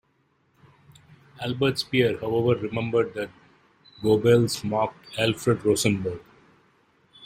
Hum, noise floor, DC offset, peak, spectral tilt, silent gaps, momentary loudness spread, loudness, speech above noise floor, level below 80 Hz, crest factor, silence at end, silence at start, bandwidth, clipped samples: none; -67 dBFS; under 0.1%; -8 dBFS; -5.5 dB/octave; none; 12 LU; -24 LUFS; 44 dB; -58 dBFS; 18 dB; 0 s; 1.4 s; 16 kHz; under 0.1%